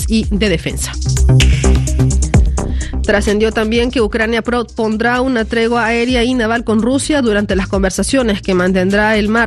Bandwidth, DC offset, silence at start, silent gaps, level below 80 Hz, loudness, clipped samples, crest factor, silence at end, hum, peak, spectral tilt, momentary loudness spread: 13 kHz; under 0.1%; 0 s; none; -20 dBFS; -14 LUFS; under 0.1%; 12 dB; 0 s; none; 0 dBFS; -5.5 dB/octave; 5 LU